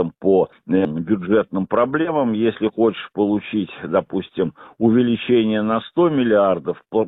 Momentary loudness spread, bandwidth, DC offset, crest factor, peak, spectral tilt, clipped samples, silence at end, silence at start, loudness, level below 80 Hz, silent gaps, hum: 7 LU; 4 kHz; under 0.1%; 16 dB; -4 dBFS; -11 dB/octave; under 0.1%; 0 s; 0 s; -19 LUFS; -54 dBFS; none; none